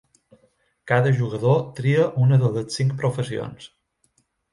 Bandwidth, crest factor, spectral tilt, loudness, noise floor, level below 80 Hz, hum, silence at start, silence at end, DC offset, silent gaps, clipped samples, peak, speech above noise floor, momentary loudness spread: 11.5 kHz; 18 dB; -7 dB/octave; -21 LUFS; -67 dBFS; -60 dBFS; none; 0.85 s; 0.85 s; under 0.1%; none; under 0.1%; -4 dBFS; 47 dB; 11 LU